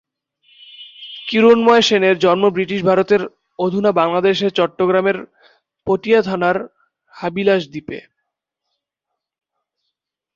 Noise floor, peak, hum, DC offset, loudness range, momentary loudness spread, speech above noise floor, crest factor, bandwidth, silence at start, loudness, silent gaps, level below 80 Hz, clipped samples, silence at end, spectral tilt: -80 dBFS; -2 dBFS; none; under 0.1%; 10 LU; 18 LU; 65 dB; 16 dB; 7.6 kHz; 0.8 s; -16 LUFS; none; -58 dBFS; under 0.1%; 2.35 s; -5.5 dB/octave